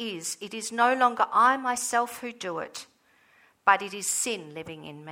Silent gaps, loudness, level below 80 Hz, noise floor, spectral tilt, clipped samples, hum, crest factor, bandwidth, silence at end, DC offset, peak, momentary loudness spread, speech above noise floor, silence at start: none; -26 LUFS; -74 dBFS; -62 dBFS; -1.5 dB/octave; under 0.1%; none; 22 dB; over 20 kHz; 0 s; under 0.1%; -6 dBFS; 18 LU; 35 dB; 0 s